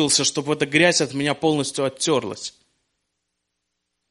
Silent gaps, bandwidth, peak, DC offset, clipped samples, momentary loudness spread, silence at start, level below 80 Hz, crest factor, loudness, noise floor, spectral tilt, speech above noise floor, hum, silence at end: none; 11.5 kHz; -2 dBFS; under 0.1%; under 0.1%; 12 LU; 0 s; -62 dBFS; 22 dB; -20 LUFS; -78 dBFS; -3 dB/octave; 57 dB; none; 1.6 s